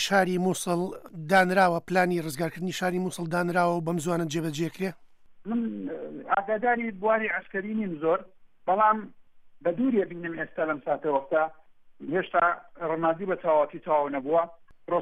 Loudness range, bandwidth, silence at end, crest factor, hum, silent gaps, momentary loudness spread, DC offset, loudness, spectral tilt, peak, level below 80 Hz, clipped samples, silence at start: 4 LU; 15.5 kHz; 0 s; 18 dB; none; none; 10 LU; under 0.1%; -27 LUFS; -5.5 dB/octave; -10 dBFS; -66 dBFS; under 0.1%; 0 s